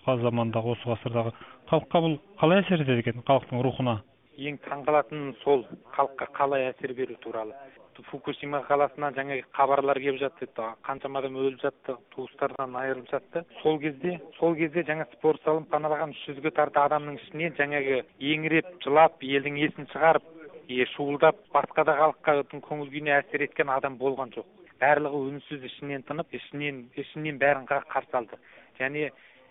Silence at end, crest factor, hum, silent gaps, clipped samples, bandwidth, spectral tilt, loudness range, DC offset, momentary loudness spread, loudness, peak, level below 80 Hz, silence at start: 0.4 s; 20 dB; none; none; under 0.1%; 3.9 kHz; -2 dB/octave; 5 LU; under 0.1%; 13 LU; -27 LUFS; -6 dBFS; -68 dBFS; 0.05 s